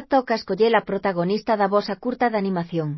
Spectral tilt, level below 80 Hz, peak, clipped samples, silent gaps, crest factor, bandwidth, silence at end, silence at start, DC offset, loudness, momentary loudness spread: -7.5 dB/octave; -60 dBFS; -4 dBFS; under 0.1%; none; 18 dB; 6 kHz; 0 s; 0 s; under 0.1%; -22 LUFS; 6 LU